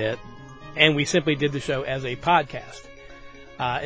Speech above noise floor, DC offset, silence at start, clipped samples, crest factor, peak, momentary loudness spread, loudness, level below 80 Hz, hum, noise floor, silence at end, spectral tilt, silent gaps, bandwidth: 20 dB; under 0.1%; 0 s; under 0.1%; 24 dB; 0 dBFS; 23 LU; -22 LUFS; -52 dBFS; none; -43 dBFS; 0 s; -4.5 dB/octave; none; 8 kHz